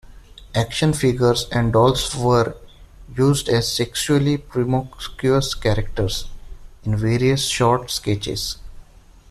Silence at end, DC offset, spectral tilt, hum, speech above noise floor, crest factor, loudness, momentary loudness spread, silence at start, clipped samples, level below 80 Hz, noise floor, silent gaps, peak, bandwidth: 0.5 s; under 0.1%; -5 dB/octave; none; 27 dB; 16 dB; -20 LUFS; 9 LU; 0.05 s; under 0.1%; -36 dBFS; -46 dBFS; none; -4 dBFS; 14 kHz